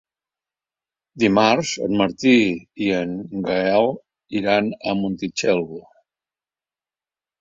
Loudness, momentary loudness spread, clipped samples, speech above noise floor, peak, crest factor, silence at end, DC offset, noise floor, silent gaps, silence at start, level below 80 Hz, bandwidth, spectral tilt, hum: -20 LUFS; 11 LU; under 0.1%; over 70 dB; -2 dBFS; 20 dB; 1.6 s; under 0.1%; under -90 dBFS; none; 1.15 s; -58 dBFS; 7.8 kHz; -5 dB/octave; none